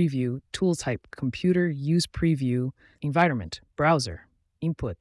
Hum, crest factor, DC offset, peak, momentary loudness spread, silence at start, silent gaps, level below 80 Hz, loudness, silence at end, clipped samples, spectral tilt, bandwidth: none; 16 dB; under 0.1%; -10 dBFS; 10 LU; 0 s; none; -50 dBFS; -26 LUFS; 0.05 s; under 0.1%; -6 dB/octave; 12 kHz